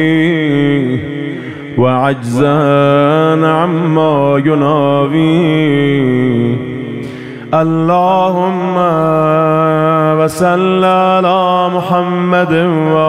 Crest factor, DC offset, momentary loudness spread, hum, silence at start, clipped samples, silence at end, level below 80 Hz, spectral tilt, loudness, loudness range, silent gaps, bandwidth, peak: 10 dB; 0.3%; 7 LU; none; 0 s; under 0.1%; 0 s; -50 dBFS; -7.5 dB/octave; -11 LUFS; 2 LU; none; 14.5 kHz; 0 dBFS